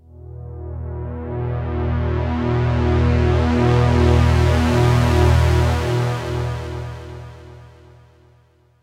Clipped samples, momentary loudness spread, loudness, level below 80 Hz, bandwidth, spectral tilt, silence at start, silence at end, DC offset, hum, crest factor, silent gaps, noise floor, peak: under 0.1%; 18 LU; -18 LUFS; -28 dBFS; 12 kHz; -7.5 dB/octave; 0.15 s; 1.15 s; under 0.1%; none; 14 dB; none; -55 dBFS; -4 dBFS